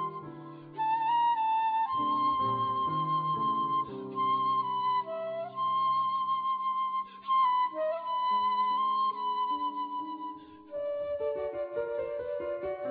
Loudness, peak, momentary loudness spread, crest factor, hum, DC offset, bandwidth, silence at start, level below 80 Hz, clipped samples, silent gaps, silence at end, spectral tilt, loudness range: -30 LUFS; -20 dBFS; 9 LU; 12 dB; none; under 0.1%; 4.9 kHz; 0 s; -70 dBFS; under 0.1%; none; 0 s; -8.5 dB/octave; 5 LU